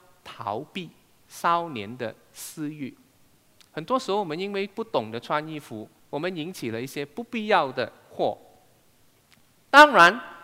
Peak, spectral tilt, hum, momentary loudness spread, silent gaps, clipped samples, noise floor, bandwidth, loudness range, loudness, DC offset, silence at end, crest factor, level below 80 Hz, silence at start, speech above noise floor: -2 dBFS; -4 dB/octave; none; 22 LU; none; under 0.1%; -60 dBFS; 16 kHz; 10 LU; -23 LUFS; under 0.1%; 0.05 s; 22 dB; -66 dBFS; 0.25 s; 36 dB